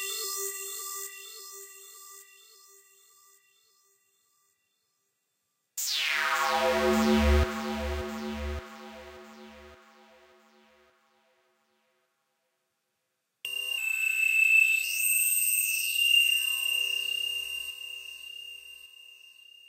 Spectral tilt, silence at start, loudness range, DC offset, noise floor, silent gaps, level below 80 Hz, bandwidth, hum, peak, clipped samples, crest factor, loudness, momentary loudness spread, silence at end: -2 dB/octave; 0 s; 19 LU; under 0.1%; -81 dBFS; none; -42 dBFS; 16 kHz; none; -12 dBFS; under 0.1%; 18 dB; -26 LUFS; 24 LU; 0.55 s